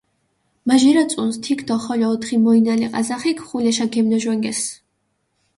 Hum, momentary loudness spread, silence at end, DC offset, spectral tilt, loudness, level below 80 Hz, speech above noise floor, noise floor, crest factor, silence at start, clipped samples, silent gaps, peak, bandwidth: none; 8 LU; 0.85 s; under 0.1%; -4 dB/octave; -18 LUFS; -62 dBFS; 52 dB; -70 dBFS; 16 dB; 0.65 s; under 0.1%; none; -4 dBFS; 11.5 kHz